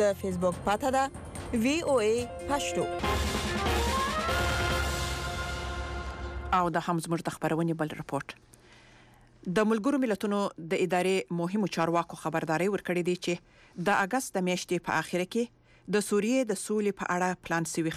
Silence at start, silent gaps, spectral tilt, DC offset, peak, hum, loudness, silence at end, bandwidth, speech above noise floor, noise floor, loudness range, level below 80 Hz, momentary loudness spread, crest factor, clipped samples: 0 s; none; -5 dB/octave; under 0.1%; -16 dBFS; none; -30 LUFS; 0 s; 15.5 kHz; 28 dB; -57 dBFS; 3 LU; -44 dBFS; 8 LU; 14 dB; under 0.1%